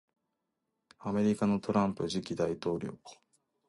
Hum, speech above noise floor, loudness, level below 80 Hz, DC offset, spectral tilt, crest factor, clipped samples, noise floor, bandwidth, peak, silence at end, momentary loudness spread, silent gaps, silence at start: none; 53 dB; -32 LUFS; -64 dBFS; under 0.1%; -6.5 dB/octave; 20 dB; under 0.1%; -84 dBFS; 11.5 kHz; -14 dBFS; 0.55 s; 13 LU; none; 1 s